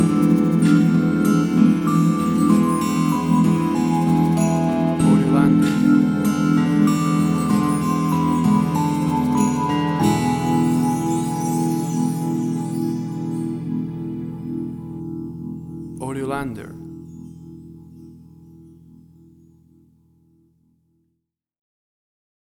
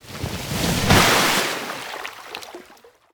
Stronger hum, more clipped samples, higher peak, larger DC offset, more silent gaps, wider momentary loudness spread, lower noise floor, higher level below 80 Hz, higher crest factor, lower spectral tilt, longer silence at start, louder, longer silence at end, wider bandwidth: neither; neither; about the same, -4 dBFS vs -2 dBFS; neither; neither; second, 15 LU vs 20 LU; first, -76 dBFS vs -50 dBFS; second, -48 dBFS vs -38 dBFS; about the same, 16 dB vs 20 dB; first, -7 dB/octave vs -3 dB/octave; about the same, 0 s vs 0.05 s; about the same, -19 LUFS vs -19 LUFS; first, 4.25 s vs 0.4 s; about the same, 18.5 kHz vs over 20 kHz